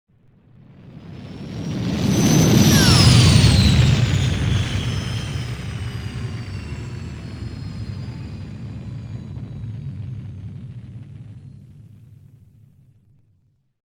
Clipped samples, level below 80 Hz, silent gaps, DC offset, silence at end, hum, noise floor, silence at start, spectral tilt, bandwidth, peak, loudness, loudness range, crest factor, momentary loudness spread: under 0.1%; -32 dBFS; none; under 0.1%; 2.05 s; none; -62 dBFS; 0.85 s; -5 dB/octave; over 20 kHz; 0 dBFS; -17 LUFS; 20 LU; 20 dB; 23 LU